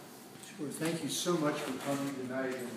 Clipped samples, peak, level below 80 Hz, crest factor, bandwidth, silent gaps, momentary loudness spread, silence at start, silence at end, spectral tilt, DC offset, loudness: under 0.1%; -20 dBFS; -82 dBFS; 16 dB; 16 kHz; none; 15 LU; 0 s; 0 s; -4 dB/octave; under 0.1%; -35 LUFS